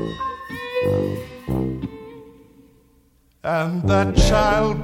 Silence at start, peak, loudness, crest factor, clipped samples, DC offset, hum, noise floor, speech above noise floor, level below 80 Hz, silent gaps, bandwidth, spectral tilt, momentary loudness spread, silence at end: 0 s; -2 dBFS; -21 LUFS; 20 dB; under 0.1%; under 0.1%; none; -58 dBFS; 40 dB; -30 dBFS; none; 16.5 kHz; -6 dB/octave; 14 LU; 0 s